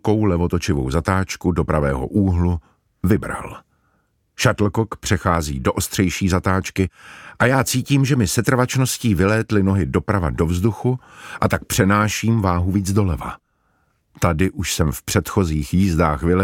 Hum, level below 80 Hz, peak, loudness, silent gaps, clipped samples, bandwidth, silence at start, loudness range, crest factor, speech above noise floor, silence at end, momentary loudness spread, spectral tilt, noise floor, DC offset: none; -34 dBFS; -2 dBFS; -19 LUFS; none; under 0.1%; 17.5 kHz; 0.05 s; 3 LU; 18 dB; 46 dB; 0 s; 6 LU; -5.5 dB/octave; -65 dBFS; under 0.1%